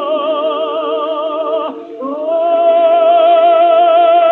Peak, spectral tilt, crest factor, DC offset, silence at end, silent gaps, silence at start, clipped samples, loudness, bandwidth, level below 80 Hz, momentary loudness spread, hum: -2 dBFS; -5 dB/octave; 10 dB; under 0.1%; 0 s; none; 0 s; under 0.1%; -12 LUFS; 4 kHz; -76 dBFS; 11 LU; none